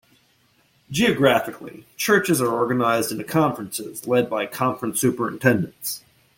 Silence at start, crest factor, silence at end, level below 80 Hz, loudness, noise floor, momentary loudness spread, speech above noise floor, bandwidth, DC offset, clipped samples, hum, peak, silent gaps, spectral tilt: 0.9 s; 20 dB; 0.4 s; -60 dBFS; -21 LUFS; -61 dBFS; 12 LU; 40 dB; 17 kHz; under 0.1%; under 0.1%; none; -2 dBFS; none; -4.5 dB/octave